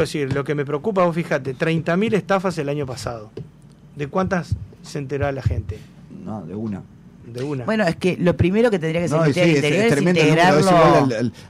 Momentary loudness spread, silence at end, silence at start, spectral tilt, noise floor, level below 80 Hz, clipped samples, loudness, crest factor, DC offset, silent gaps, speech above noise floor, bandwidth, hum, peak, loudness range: 18 LU; 0 s; 0 s; -6.5 dB/octave; -45 dBFS; -44 dBFS; under 0.1%; -19 LUFS; 12 dB; under 0.1%; none; 26 dB; 14 kHz; none; -6 dBFS; 10 LU